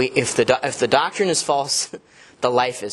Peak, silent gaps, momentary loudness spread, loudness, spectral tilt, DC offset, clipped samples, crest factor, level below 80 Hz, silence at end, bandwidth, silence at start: 0 dBFS; none; 5 LU; -20 LUFS; -3 dB/octave; under 0.1%; under 0.1%; 20 dB; -58 dBFS; 0 s; 12.5 kHz; 0 s